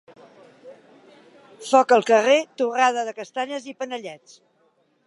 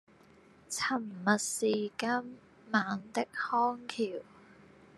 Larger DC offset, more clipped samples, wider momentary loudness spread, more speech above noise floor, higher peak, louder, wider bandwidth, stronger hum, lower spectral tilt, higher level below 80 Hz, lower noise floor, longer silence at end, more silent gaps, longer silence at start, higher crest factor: neither; neither; first, 16 LU vs 7 LU; first, 43 dB vs 28 dB; first, -2 dBFS vs -12 dBFS; first, -21 LUFS vs -33 LUFS; second, 11.5 kHz vs 13 kHz; neither; about the same, -3 dB/octave vs -3.5 dB/octave; second, -84 dBFS vs -78 dBFS; first, -64 dBFS vs -60 dBFS; first, 0.9 s vs 0.45 s; neither; about the same, 0.65 s vs 0.7 s; about the same, 20 dB vs 24 dB